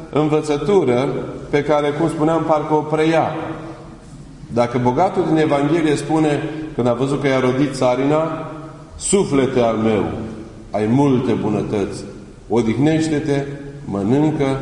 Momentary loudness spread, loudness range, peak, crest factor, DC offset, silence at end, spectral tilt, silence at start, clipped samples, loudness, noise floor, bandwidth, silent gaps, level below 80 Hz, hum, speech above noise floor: 15 LU; 2 LU; -2 dBFS; 16 dB; under 0.1%; 0 s; -6.5 dB/octave; 0 s; under 0.1%; -18 LUFS; -37 dBFS; 11 kHz; none; -44 dBFS; none; 20 dB